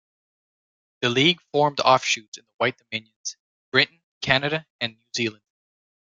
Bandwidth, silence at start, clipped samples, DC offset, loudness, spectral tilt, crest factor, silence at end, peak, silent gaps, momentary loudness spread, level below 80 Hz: 9.6 kHz; 1 s; under 0.1%; under 0.1%; -23 LUFS; -3.5 dB/octave; 24 dB; 0.8 s; 0 dBFS; 2.28-2.32 s, 2.54-2.59 s, 3.16-3.24 s, 3.39-3.72 s, 4.04-4.21 s, 4.70-4.79 s; 14 LU; -62 dBFS